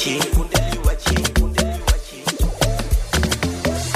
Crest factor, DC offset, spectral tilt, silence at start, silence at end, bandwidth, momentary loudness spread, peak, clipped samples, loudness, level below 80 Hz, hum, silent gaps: 18 dB; under 0.1%; -4 dB/octave; 0 s; 0 s; 16 kHz; 4 LU; -2 dBFS; under 0.1%; -20 LUFS; -22 dBFS; none; none